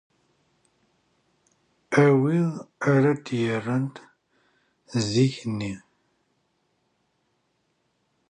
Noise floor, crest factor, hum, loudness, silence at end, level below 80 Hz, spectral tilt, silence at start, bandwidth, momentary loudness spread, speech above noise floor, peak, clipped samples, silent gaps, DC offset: -72 dBFS; 22 dB; none; -24 LUFS; 2.55 s; -64 dBFS; -6.5 dB/octave; 1.9 s; 10 kHz; 13 LU; 49 dB; -4 dBFS; under 0.1%; none; under 0.1%